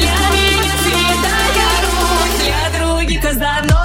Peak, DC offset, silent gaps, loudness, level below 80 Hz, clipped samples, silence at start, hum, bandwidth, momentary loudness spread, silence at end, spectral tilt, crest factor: 0 dBFS; under 0.1%; none; -13 LUFS; -20 dBFS; under 0.1%; 0 s; none; 16.5 kHz; 4 LU; 0 s; -3.5 dB/octave; 12 dB